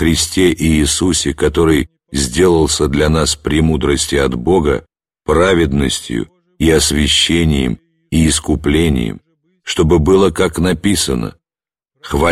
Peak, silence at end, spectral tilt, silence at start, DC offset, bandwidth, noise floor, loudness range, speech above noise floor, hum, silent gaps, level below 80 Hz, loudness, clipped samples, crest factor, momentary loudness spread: 0 dBFS; 0 s; -4.5 dB/octave; 0 s; 0.2%; 15 kHz; under -90 dBFS; 1 LU; over 77 dB; none; none; -26 dBFS; -14 LUFS; under 0.1%; 14 dB; 10 LU